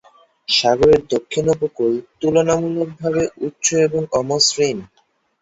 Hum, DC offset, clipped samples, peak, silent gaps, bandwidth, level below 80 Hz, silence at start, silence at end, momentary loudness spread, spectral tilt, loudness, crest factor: none; under 0.1%; under 0.1%; -2 dBFS; none; 8 kHz; -48 dBFS; 0.5 s; 0.55 s; 8 LU; -3.5 dB/octave; -17 LUFS; 16 dB